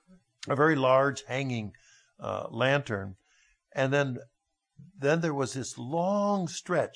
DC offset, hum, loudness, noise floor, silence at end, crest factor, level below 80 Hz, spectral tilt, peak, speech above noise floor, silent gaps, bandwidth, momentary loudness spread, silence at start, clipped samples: under 0.1%; none; -29 LUFS; -68 dBFS; 0.05 s; 18 dB; -72 dBFS; -5.5 dB/octave; -10 dBFS; 39 dB; none; 10.5 kHz; 14 LU; 0.45 s; under 0.1%